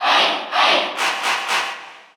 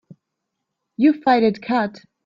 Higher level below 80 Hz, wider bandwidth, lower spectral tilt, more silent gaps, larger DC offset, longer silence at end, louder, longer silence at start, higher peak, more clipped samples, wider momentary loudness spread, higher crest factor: second, -84 dBFS vs -64 dBFS; first, over 20 kHz vs 7.2 kHz; second, 0 dB/octave vs -7.5 dB/octave; neither; neither; second, 0.15 s vs 0.35 s; about the same, -18 LUFS vs -19 LUFS; second, 0 s vs 1 s; about the same, -4 dBFS vs -4 dBFS; neither; second, 8 LU vs 11 LU; about the same, 16 dB vs 18 dB